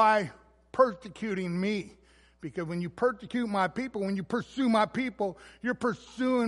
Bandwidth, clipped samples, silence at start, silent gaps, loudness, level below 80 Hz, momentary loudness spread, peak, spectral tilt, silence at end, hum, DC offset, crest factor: 11.5 kHz; under 0.1%; 0 s; none; -30 LUFS; -64 dBFS; 11 LU; -10 dBFS; -6.5 dB/octave; 0 s; none; under 0.1%; 20 dB